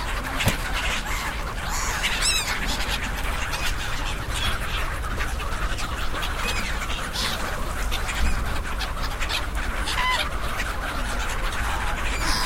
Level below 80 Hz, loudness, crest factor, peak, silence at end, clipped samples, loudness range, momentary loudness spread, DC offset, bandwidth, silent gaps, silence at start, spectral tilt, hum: -28 dBFS; -26 LUFS; 18 dB; -8 dBFS; 0 s; under 0.1%; 3 LU; 6 LU; under 0.1%; 16 kHz; none; 0 s; -2.5 dB/octave; none